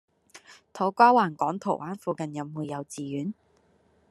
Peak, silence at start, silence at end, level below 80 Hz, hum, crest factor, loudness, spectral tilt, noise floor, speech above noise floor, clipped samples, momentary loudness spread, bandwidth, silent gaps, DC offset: -4 dBFS; 0.35 s; 0.8 s; -76 dBFS; none; 24 dB; -26 LUFS; -6 dB/octave; -64 dBFS; 38 dB; under 0.1%; 16 LU; 12.5 kHz; none; under 0.1%